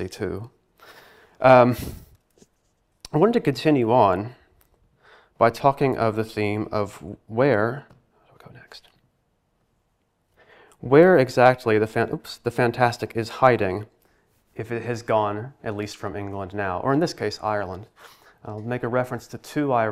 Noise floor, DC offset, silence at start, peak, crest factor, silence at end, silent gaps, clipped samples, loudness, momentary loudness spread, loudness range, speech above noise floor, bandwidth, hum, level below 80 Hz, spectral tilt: -70 dBFS; under 0.1%; 0 s; -2 dBFS; 22 dB; 0 s; none; under 0.1%; -22 LUFS; 17 LU; 8 LU; 48 dB; 15.5 kHz; none; -56 dBFS; -7 dB/octave